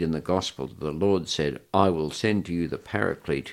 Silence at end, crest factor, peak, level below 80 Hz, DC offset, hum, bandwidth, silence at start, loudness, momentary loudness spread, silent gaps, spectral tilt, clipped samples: 0 s; 22 dB; -4 dBFS; -50 dBFS; under 0.1%; none; 15.5 kHz; 0 s; -26 LUFS; 7 LU; none; -5.5 dB/octave; under 0.1%